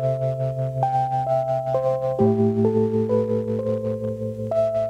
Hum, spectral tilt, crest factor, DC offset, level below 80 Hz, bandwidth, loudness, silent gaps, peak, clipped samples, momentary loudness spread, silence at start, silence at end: none; -10 dB/octave; 16 dB; under 0.1%; -54 dBFS; 10 kHz; -23 LUFS; none; -6 dBFS; under 0.1%; 6 LU; 0 s; 0 s